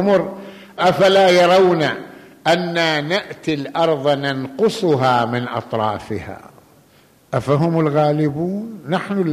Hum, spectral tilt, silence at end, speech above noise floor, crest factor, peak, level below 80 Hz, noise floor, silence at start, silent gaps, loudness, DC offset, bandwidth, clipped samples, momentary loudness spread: none; -6 dB/octave; 0 s; 35 dB; 14 dB; -4 dBFS; -56 dBFS; -52 dBFS; 0 s; none; -17 LUFS; under 0.1%; 15 kHz; under 0.1%; 15 LU